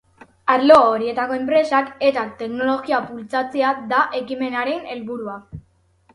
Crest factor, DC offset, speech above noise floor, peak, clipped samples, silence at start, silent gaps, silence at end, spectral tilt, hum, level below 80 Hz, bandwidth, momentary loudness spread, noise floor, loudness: 20 dB; under 0.1%; 39 dB; 0 dBFS; under 0.1%; 0.45 s; none; 0.55 s; -5.5 dB/octave; none; -58 dBFS; 11.5 kHz; 16 LU; -58 dBFS; -19 LUFS